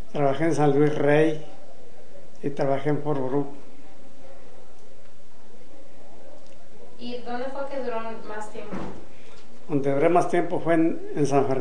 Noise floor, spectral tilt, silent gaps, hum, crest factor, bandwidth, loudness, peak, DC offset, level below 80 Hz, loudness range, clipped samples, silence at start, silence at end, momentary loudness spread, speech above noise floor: -53 dBFS; -7 dB/octave; none; none; 20 dB; 10 kHz; -25 LUFS; -8 dBFS; 6%; -60 dBFS; 13 LU; under 0.1%; 0.15 s; 0 s; 16 LU; 29 dB